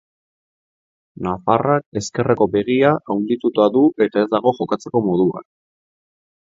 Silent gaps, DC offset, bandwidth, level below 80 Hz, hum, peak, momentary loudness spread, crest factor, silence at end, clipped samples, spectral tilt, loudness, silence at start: 1.86-1.92 s; under 0.1%; 7.8 kHz; -54 dBFS; none; 0 dBFS; 8 LU; 18 dB; 1.15 s; under 0.1%; -6.5 dB/octave; -18 LUFS; 1.2 s